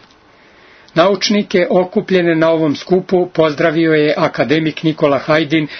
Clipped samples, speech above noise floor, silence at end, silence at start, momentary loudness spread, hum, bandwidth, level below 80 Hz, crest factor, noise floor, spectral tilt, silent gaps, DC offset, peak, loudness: under 0.1%; 33 dB; 0 s; 0.95 s; 3 LU; none; 6.4 kHz; -54 dBFS; 14 dB; -46 dBFS; -6 dB/octave; none; under 0.1%; 0 dBFS; -14 LUFS